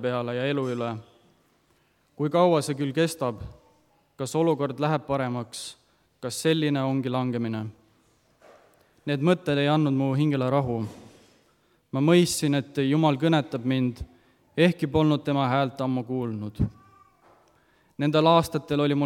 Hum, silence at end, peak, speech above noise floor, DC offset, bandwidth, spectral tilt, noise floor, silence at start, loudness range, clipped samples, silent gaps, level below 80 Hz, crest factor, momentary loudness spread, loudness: none; 0 s; -6 dBFS; 41 dB; under 0.1%; 16 kHz; -6 dB/octave; -66 dBFS; 0 s; 4 LU; under 0.1%; none; -52 dBFS; 20 dB; 14 LU; -25 LUFS